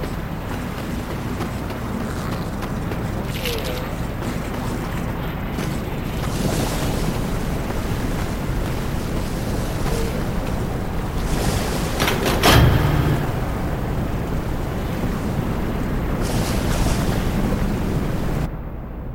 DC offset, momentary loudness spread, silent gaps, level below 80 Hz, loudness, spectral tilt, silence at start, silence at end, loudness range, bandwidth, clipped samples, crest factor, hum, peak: under 0.1%; 7 LU; none; -28 dBFS; -23 LUFS; -5.5 dB/octave; 0 s; 0 s; 6 LU; 16.5 kHz; under 0.1%; 20 dB; none; 0 dBFS